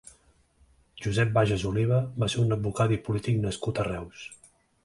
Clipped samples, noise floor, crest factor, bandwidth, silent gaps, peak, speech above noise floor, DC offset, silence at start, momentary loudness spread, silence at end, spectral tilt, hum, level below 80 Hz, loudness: under 0.1%; -62 dBFS; 18 dB; 11.5 kHz; none; -10 dBFS; 36 dB; under 0.1%; 0.95 s; 12 LU; 0.5 s; -6.5 dB/octave; none; -50 dBFS; -27 LUFS